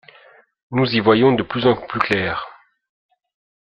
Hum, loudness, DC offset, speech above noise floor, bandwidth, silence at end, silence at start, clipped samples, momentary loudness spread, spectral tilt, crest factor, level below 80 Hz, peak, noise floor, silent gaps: none; -18 LUFS; under 0.1%; 33 dB; 7.6 kHz; 1.1 s; 0.7 s; under 0.1%; 11 LU; -7.5 dB/octave; 20 dB; -54 dBFS; 0 dBFS; -50 dBFS; none